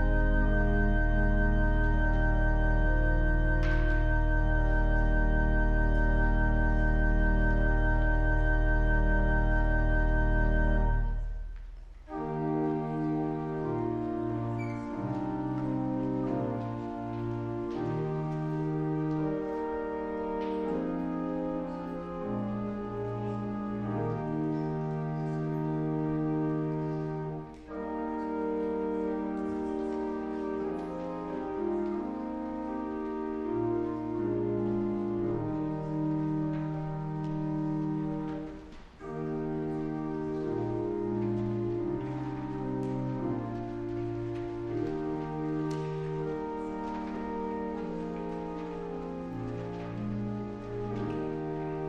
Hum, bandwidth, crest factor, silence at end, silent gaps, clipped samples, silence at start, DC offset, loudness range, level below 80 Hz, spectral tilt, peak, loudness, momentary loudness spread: none; 4.9 kHz; 14 dB; 0 s; none; under 0.1%; 0 s; under 0.1%; 6 LU; -32 dBFS; -9 dB/octave; -16 dBFS; -32 LUFS; 8 LU